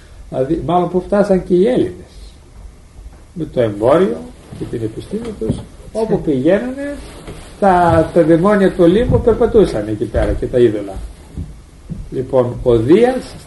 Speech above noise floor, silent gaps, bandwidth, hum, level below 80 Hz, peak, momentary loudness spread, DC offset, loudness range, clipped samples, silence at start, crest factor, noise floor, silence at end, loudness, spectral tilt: 23 dB; none; 11.5 kHz; none; -32 dBFS; 0 dBFS; 20 LU; under 0.1%; 7 LU; under 0.1%; 0.1 s; 14 dB; -37 dBFS; 0 s; -15 LUFS; -8 dB/octave